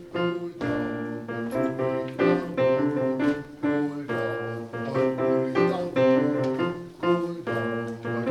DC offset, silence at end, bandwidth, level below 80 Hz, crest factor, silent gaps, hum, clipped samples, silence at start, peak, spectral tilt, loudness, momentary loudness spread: under 0.1%; 0 s; 12 kHz; -60 dBFS; 16 dB; none; none; under 0.1%; 0 s; -8 dBFS; -7.5 dB/octave; -26 LUFS; 8 LU